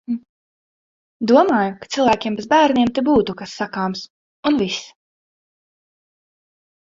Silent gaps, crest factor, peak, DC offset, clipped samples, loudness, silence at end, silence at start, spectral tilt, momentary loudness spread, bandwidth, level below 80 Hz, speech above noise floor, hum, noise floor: 0.29-1.20 s, 4.10-4.43 s; 18 dB; -2 dBFS; under 0.1%; under 0.1%; -18 LUFS; 2 s; 0.1 s; -5 dB/octave; 13 LU; 7.8 kHz; -54 dBFS; over 73 dB; none; under -90 dBFS